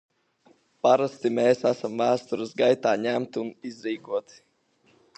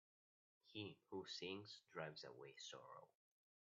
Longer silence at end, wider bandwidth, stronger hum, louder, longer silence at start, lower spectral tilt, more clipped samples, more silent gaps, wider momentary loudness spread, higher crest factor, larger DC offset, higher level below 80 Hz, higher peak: first, 0.95 s vs 0.6 s; first, 8.6 kHz vs 7.4 kHz; neither; first, -25 LUFS vs -55 LUFS; first, 0.85 s vs 0.65 s; first, -5.5 dB/octave vs -2.5 dB/octave; neither; neither; about the same, 11 LU vs 9 LU; about the same, 20 dB vs 22 dB; neither; first, -78 dBFS vs under -90 dBFS; first, -6 dBFS vs -34 dBFS